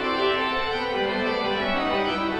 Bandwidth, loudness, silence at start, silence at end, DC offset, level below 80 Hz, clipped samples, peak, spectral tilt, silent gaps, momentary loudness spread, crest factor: 10.5 kHz; -24 LUFS; 0 s; 0 s; under 0.1%; -48 dBFS; under 0.1%; -10 dBFS; -5 dB/octave; none; 2 LU; 14 dB